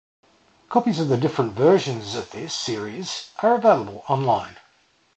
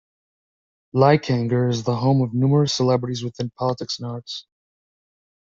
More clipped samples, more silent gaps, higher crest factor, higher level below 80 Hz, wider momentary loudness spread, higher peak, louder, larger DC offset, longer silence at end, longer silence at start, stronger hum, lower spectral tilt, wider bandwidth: neither; neither; about the same, 20 dB vs 18 dB; about the same, -60 dBFS vs -58 dBFS; about the same, 12 LU vs 13 LU; about the same, -4 dBFS vs -2 dBFS; about the same, -22 LUFS vs -21 LUFS; neither; second, 0.65 s vs 1 s; second, 0.7 s vs 0.95 s; neither; about the same, -5.5 dB/octave vs -6.5 dB/octave; first, 8.8 kHz vs 7.6 kHz